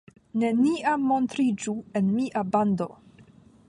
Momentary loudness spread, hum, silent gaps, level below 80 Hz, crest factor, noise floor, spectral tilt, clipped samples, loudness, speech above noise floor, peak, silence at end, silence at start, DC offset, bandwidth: 7 LU; none; none; -66 dBFS; 16 dB; -53 dBFS; -6.5 dB/octave; under 0.1%; -26 LUFS; 29 dB; -10 dBFS; 0.75 s; 0.35 s; under 0.1%; 11 kHz